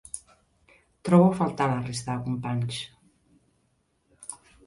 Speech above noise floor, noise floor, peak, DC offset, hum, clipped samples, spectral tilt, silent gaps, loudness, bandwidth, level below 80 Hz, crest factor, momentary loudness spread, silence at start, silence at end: 46 dB; -71 dBFS; -8 dBFS; under 0.1%; none; under 0.1%; -6.5 dB/octave; none; -25 LUFS; 11.5 kHz; -60 dBFS; 20 dB; 21 LU; 0.15 s; 0.3 s